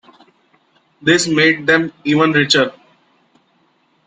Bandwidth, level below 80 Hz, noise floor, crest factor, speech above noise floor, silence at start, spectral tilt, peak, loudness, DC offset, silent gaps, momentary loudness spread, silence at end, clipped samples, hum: 9.6 kHz; -58 dBFS; -59 dBFS; 18 dB; 45 dB; 1.05 s; -4 dB/octave; 0 dBFS; -14 LUFS; under 0.1%; none; 6 LU; 1.35 s; under 0.1%; none